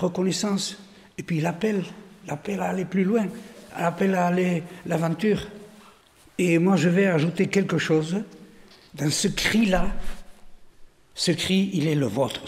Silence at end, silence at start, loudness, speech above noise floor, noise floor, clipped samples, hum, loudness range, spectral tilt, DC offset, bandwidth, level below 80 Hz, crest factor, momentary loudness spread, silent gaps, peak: 0 s; 0 s; -24 LUFS; 31 dB; -54 dBFS; under 0.1%; none; 4 LU; -5.5 dB/octave; under 0.1%; 15.5 kHz; -42 dBFS; 16 dB; 18 LU; none; -8 dBFS